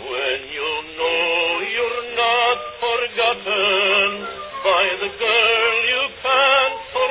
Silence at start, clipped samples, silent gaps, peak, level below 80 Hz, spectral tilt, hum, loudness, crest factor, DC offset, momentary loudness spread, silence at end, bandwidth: 0 s; under 0.1%; none; -4 dBFS; -56 dBFS; -5.5 dB/octave; none; -18 LUFS; 16 dB; under 0.1%; 8 LU; 0 s; 4 kHz